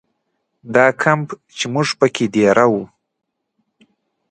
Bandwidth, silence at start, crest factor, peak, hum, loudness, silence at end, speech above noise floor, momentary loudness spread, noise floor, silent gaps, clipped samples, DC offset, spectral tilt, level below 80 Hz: 11 kHz; 0.65 s; 18 dB; 0 dBFS; none; -16 LUFS; 1.45 s; 56 dB; 11 LU; -72 dBFS; none; under 0.1%; under 0.1%; -5 dB/octave; -60 dBFS